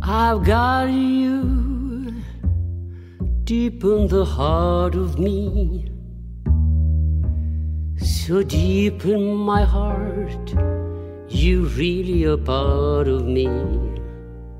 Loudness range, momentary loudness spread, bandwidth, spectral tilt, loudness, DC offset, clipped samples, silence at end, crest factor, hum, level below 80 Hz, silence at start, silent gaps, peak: 2 LU; 11 LU; 14.5 kHz; -7.5 dB/octave; -21 LUFS; under 0.1%; under 0.1%; 0 s; 16 dB; none; -24 dBFS; 0 s; none; -4 dBFS